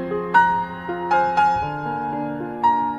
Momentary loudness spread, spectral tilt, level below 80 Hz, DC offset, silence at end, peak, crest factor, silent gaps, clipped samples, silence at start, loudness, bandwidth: 10 LU; -6.5 dB/octave; -50 dBFS; under 0.1%; 0 s; -4 dBFS; 18 dB; none; under 0.1%; 0 s; -21 LUFS; 8.6 kHz